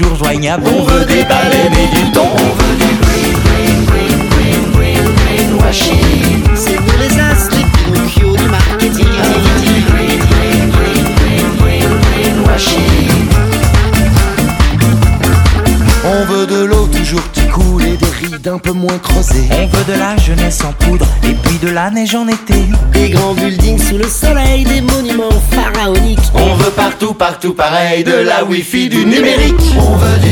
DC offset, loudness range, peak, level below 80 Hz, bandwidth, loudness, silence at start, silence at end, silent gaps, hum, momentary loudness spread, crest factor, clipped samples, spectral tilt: under 0.1%; 2 LU; 0 dBFS; -14 dBFS; 19.5 kHz; -10 LUFS; 0 s; 0 s; none; none; 4 LU; 8 dB; 0.2%; -5 dB/octave